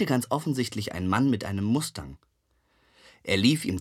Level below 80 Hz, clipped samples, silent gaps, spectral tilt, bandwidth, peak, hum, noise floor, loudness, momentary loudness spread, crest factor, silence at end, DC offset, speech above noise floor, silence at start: -56 dBFS; under 0.1%; none; -5 dB/octave; 16 kHz; -8 dBFS; none; -69 dBFS; -26 LUFS; 14 LU; 20 dB; 0 s; under 0.1%; 43 dB; 0 s